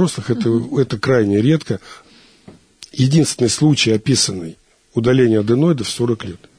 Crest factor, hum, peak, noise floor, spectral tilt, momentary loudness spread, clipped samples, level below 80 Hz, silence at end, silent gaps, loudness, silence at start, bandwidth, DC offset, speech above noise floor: 14 dB; none; -2 dBFS; -45 dBFS; -5.5 dB/octave; 11 LU; under 0.1%; -52 dBFS; 0.2 s; none; -16 LUFS; 0 s; 11 kHz; under 0.1%; 29 dB